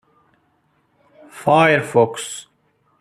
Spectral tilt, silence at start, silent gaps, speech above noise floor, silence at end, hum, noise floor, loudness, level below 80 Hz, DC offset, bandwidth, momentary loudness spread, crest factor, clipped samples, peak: -5 dB/octave; 1.35 s; none; 46 dB; 0.6 s; none; -63 dBFS; -17 LUFS; -64 dBFS; under 0.1%; 14 kHz; 16 LU; 18 dB; under 0.1%; -2 dBFS